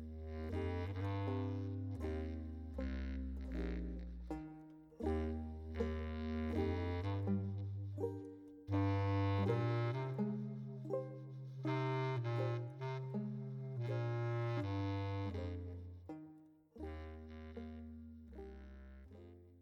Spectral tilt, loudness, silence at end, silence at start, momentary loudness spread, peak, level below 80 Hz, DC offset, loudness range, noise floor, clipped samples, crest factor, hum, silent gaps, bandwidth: -9 dB/octave; -42 LUFS; 0 s; 0 s; 16 LU; -26 dBFS; -52 dBFS; under 0.1%; 8 LU; -62 dBFS; under 0.1%; 16 dB; none; none; 6.6 kHz